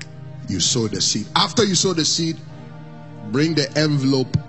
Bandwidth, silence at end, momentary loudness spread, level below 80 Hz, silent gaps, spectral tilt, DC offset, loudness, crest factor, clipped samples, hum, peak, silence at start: 8.4 kHz; 0 s; 21 LU; -52 dBFS; none; -3.5 dB/octave; 0.6%; -19 LUFS; 18 dB; under 0.1%; none; -2 dBFS; 0 s